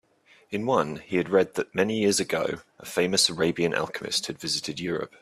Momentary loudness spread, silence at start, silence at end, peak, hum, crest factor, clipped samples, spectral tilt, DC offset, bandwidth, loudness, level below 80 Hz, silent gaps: 9 LU; 0.5 s; 0.15 s; -8 dBFS; none; 20 dB; under 0.1%; -3.5 dB/octave; under 0.1%; 15.5 kHz; -26 LUFS; -64 dBFS; none